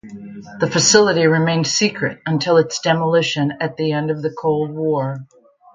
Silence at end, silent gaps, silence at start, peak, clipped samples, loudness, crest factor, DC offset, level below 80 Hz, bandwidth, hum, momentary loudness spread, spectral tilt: 0.5 s; none; 0.05 s; 0 dBFS; under 0.1%; -17 LUFS; 18 dB; under 0.1%; -60 dBFS; 9.6 kHz; none; 11 LU; -4 dB/octave